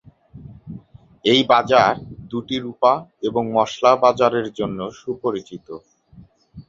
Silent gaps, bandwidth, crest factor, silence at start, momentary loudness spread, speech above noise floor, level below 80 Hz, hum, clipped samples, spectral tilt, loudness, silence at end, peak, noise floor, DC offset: none; 7.6 kHz; 20 dB; 0.35 s; 23 LU; 30 dB; -54 dBFS; none; under 0.1%; -5 dB/octave; -19 LUFS; 0.1 s; -2 dBFS; -48 dBFS; under 0.1%